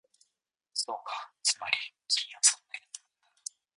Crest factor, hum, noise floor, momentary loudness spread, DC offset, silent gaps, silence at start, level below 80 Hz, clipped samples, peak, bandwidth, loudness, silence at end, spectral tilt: 28 dB; none; -84 dBFS; 19 LU; under 0.1%; none; 0.75 s; -86 dBFS; under 0.1%; -8 dBFS; 11.5 kHz; -29 LUFS; 0.8 s; 4 dB/octave